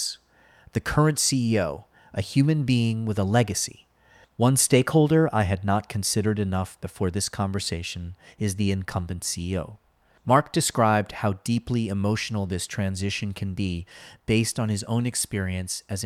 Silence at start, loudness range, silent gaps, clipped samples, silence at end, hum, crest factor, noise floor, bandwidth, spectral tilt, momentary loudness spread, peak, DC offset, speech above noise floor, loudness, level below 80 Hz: 0 s; 5 LU; none; under 0.1%; 0 s; none; 20 dB; -57 dBFS; 15.5 kHz; -5 dB/octave; 12 LU; -4 dBFS; under 0.1%; 33 dB; -25 LUFS; -50 dBFS